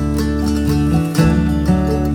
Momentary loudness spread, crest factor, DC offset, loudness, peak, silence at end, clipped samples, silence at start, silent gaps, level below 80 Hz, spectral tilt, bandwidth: 3 LU; 14 dB; under 0.1%; -16 LUFS; -2 dBFS; 0 s; under 0.1%; 0 s; none; -22 dBFS; -7 dB/octave; 18 kHz